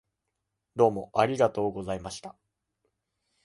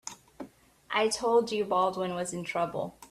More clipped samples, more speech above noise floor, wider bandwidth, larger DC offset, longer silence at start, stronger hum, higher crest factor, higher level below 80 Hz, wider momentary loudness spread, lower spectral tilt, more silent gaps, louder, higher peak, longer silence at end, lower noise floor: neither; first, 56 dB vs 21 dB; second, 11.5 kHz vs 14 kHz; neither; first, 0.75 s vs 0.05 s; neither; about the same, 22 dB vs 18 dB; first, -60 dBFS vs -66 dBFS; second, 16 LU vs 21 LU; first, -6 dB/octave vs -3.5 dB/octave; neither; about the same, -27 LUFS vs -29 LUFS; first, -8 dBFS vs -12 dBFS; first, 1.15 s vs 0.05 s; first, -83 dBFS vs -50 dBFS